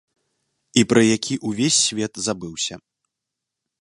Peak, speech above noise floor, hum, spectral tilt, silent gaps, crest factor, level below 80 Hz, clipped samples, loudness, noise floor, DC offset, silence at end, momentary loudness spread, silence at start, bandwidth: 0 dBFS; 63 dB; none; -3.5 dB/octave; none; 22 dB; -58 dBFS; under 0.1%; -20 LUFS; -83 dBFS; under 0.1%; 1.05 s; 10 LU; 0.75 s; 11.5 kHz